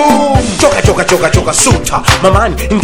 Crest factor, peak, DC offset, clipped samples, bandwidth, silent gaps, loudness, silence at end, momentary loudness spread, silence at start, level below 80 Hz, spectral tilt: 8 dB; 0 dBFS; under 0.1%; 3%; over 20 kHz; none; -9 LUFS; 0 s; 3 LU; 0 s; -20 dBFS; -4 dB/octave